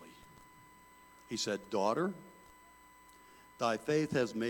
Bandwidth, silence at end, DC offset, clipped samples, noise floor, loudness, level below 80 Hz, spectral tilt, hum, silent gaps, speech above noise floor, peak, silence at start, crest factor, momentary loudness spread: 18.5 kHz; 0 s; under 0.1%; under 0.1%; -60 dBFS; -35 LUFS; -72 dBFS; -4.5 dB/octave; none; none; 26 dB; -18 dBFS; 0 s; 20 dB; 25 LU